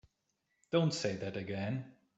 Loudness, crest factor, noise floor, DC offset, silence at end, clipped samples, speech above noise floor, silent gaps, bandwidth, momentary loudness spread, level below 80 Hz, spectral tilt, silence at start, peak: -36 LUFS; 20 dB; -82 dBFS; under 0.1%; 0.25 s; under 0.1%; 47 dB; none; 8.2 kHz; 8 LU; -74 dBFS; -5.5 dB/octave; 0.7 s; -18 dBFS